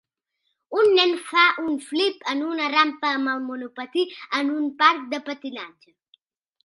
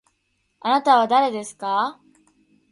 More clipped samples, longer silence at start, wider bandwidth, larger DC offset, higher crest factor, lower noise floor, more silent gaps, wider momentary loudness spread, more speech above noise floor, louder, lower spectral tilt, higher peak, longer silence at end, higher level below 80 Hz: neither; about the same, 0.7 s vs 0.65 s; about the same, 11.5 kHz vs 11.5 kHz; neither; about the same, 22 dB vs 18 dB; first, -76 dBFS vs -70 dBFS; neither; about the same, 14 LU vs 12 LU; about the same, 53 dB vs 51 dB; about the same, -22 LUFS vs -20 LUFS; second, -2 dB/octave vs -3.5 dB/octave; about the same, -2 dBFS vs -4 dBFS; first, 0.95 s vs 0.8 s; about the same, -78 dBFS vs -74 dBFS